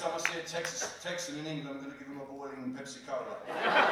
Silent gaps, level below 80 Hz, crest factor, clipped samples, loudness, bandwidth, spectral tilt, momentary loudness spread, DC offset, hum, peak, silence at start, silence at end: none; -74 dBFS; 24 dB; under 0.1%; -36 LUFS; 18.5 kHz; -2.5 dB/octave; 12 LU; under 0.1%; none; -10 dBFS; 0 s; 0 s